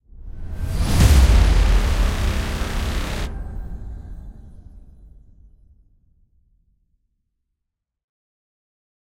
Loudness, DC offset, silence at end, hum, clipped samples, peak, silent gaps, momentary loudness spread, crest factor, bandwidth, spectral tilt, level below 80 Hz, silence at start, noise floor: -20 LUFS; under 0.1%; 4.15 s; none; under 0.1%; -2 dBFS; none; 24 LU; 20 dB; 16 kHz; -5.5 dB/octave; -22 dBFS; 0.1 s; -81 dBFS